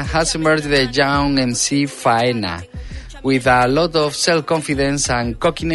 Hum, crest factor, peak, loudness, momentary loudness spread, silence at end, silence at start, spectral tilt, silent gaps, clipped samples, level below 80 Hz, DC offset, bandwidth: none; 16 dB; 0 dBFS; -17 LUFS; 10 LU; 0 s; 0 s; -4 dB/octave; none; under 0.1%; -34 dBFS; under 0.1%; 12 kHz